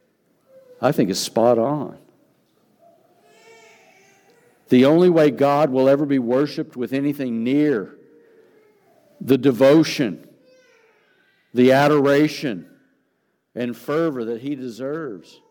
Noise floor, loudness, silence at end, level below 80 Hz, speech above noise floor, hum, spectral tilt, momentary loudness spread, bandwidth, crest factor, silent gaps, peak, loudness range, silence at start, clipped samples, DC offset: -69 dBFS; -19 LUFS; 0.3 s; -70 dBFS; 51 dB; none; -6 dB/octave; 15 LU; 19 kHz; 18 dB; none; -4 dBFS; 7 LU; 0.8 s; under 0.1%; under 0.1%